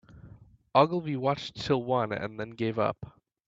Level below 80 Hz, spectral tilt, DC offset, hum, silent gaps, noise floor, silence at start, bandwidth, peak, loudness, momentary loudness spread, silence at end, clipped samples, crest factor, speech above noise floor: -62 dBFS; -7 dB/octave; under 0.1%; none; none; -53 dBFS; 0.15 s; 7.8 kHz; -6 dBFS; -29 LUFS; 11 LU; 0.4 s; under 0.1%; 24 dB; 25 dB